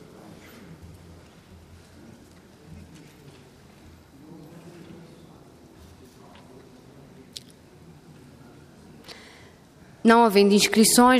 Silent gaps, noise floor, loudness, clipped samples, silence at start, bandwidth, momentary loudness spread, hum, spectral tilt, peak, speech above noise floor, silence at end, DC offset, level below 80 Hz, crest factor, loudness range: none; -51 dBFS; -18 LUFS; under 0.1%; 9.1 s; 15 kHz; 30 LU; none; -3.5 dB/octave; -4 dBFS; 34 dB; 0 s; under 0.1%; -60 dBFS; 22 dB; 25 LU